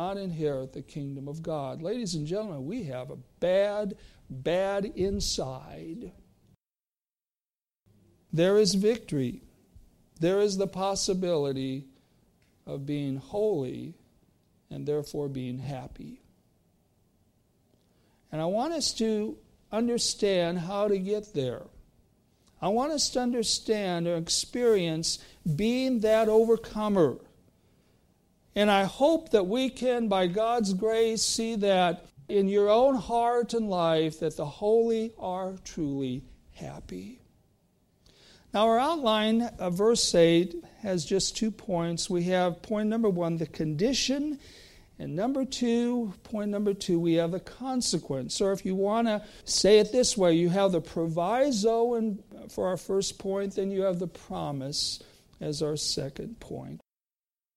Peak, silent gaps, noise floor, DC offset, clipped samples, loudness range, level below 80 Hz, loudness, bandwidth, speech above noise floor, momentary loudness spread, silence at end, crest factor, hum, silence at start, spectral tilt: -10 dBFS; none; under -90 dBFS; under 0.1%; under 0.1%; 9 LU; -56 dBFS; -28 LUFS; 15.5 kHz; over 63 dB; 15 LU; 0.8 s; 20 dB; none; 0 s; -4.5 dB/octave